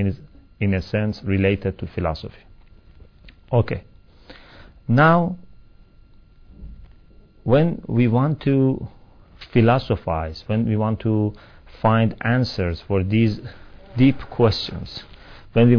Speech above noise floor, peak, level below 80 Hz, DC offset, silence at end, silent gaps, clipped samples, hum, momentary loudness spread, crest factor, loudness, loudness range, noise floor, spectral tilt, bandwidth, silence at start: 29 dB; -4 dBFS; -42 dBFS; under 0.1%; 0 s; none; under 0.1%; none; 15 LU; 18 dB; -21 LUFS; 5 LU; -49 dBFS; -9 dB/octave; 5.4 kHz; 0 s